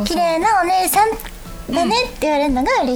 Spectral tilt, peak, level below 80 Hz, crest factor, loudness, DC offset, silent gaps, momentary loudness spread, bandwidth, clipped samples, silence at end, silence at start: -3 dB/octave; -4 dBFS; -36 dBFS; 14 dB; -17 LUFS; under 0.1%; none; 11 LU; over 20 kHz; under 0.1%; 0 s; 0 s